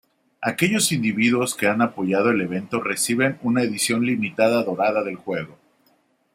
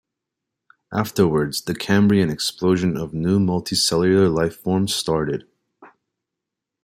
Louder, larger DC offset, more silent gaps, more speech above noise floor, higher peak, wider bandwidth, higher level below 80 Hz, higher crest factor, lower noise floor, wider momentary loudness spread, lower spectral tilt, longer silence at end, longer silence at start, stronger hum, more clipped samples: about the same, -21 LUFS vs -20 LUFS; neither; neither; second, 42 dB vs 64 dB; about the same, -4 dBFS vs -4 dBFS; about the same, 16 kHz vs 16 kHz; second, -66 dBFS vs -52 dBFS; about the same, 18 dB vs 18 dB; second, -63 dBFS vs -84 dBFS; about the same, 8 LU vs 8 LU; about the same, -4 dB/octave vs -5 dB/octave; second, 0.85 s vs 1 s; second, 0.4 s vs 0.9 s; neither; neither